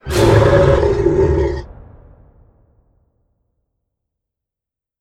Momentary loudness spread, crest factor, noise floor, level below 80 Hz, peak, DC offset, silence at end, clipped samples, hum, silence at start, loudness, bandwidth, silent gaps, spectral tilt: 9 LU; 18 dB; -85 dBFS; -28 dBFS; 0 dBFS; under 0.1%; 3.35 s; under 0.1%; none; 0.05 s; -13 LUFS; 15.5 kHz; none; -7 dB/octave